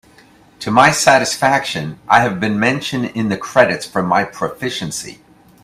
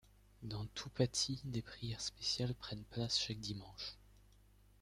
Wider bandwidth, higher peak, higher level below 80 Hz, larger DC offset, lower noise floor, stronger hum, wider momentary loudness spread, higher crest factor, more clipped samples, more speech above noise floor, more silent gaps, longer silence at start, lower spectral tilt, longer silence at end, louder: first, 16 kHz vs 14.5 kHz; first, 0 dBFS vs -20 dBFS; first, -52 dBFS vs -62 dBFS; neither; second, -47 dBFS vs -66 dBFS; second, none vs 50 Hz at -60 dBFS; about the same, 12 LU vs 11 LU; second, 16 dB vs 22 dB; neither; first, 32 dB vs 25 dB; neither; first, 0.6 s vs 0.4 s; about the same, -4 dB/octave vs -4 dB/octave; about the same, 0.5 s vs 0.6 s; first, -15 LUFS vs -41 LUFS